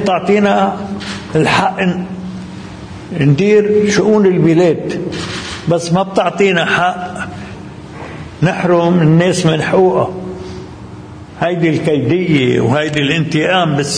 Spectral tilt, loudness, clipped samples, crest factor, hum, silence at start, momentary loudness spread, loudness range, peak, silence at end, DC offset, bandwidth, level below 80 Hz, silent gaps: -6 dB/octave; -13 LUFS; under 0.1%; 12 dB; none; 0 s; 18 LU; 3 LU; 0 dBFS; 0 s; under 0.1%; 10.5 kHz; -44 dBFS; none